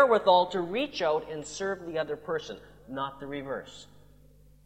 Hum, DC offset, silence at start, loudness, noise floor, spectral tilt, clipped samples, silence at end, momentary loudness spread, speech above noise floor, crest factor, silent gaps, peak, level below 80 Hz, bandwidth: 50 Hz at -60 dBFS; under 0.1%; 0 s; -29 LUFS; -57 dBFS; -4.5 dB/octave; under 0.1%; 0.8 s; 19 LU; 28 dB; 22 dB; none; -8 dBFS; -60 dBFS; 9 kHz